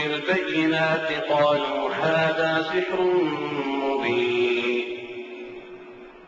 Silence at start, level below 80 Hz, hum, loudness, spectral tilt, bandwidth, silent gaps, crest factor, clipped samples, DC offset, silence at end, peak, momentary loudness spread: 0 s; -62 dBFS; none; -23 LUFS; -6 dB/octave; 7.6 kHz; none; 16 dB; under 0.1%; under 0.1%; 0 s; -8 dBFS; 16 LU